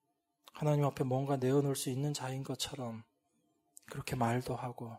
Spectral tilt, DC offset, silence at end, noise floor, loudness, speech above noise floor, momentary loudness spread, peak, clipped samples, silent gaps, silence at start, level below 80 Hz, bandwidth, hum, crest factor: -6 dB/octave; under 0.1%; 0 s; -78 dBFS; -35 LUFS; 43 dB; 13 LU; -18 dBFS; under 0.1%; none; 0.55 s; -66 dBFS; 16 kHz; none; 18 dB